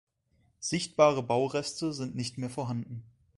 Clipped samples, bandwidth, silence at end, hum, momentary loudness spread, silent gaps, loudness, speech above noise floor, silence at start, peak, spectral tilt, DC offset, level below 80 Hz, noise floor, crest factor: under 0.1%; 11.5 kHz; 0.3 s; none; 13 LU; none; -30 LUFS; 40 dB; 0.6 s; -8 dBFS; -5 dB/octave; under 0.1%; -66 dBFS; -70 dBFS; 22 dB